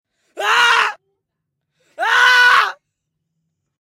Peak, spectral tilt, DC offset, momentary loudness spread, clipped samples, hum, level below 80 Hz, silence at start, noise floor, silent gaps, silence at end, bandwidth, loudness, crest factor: -2 dBFS; 2 dB/octave; under 0.1%; 12 LU; under 0.1%; none; -74 dBFS; 0.35 s; -76 dBFS; none; 1.15 s; 16 kHz; -13 LUFS; 16 dB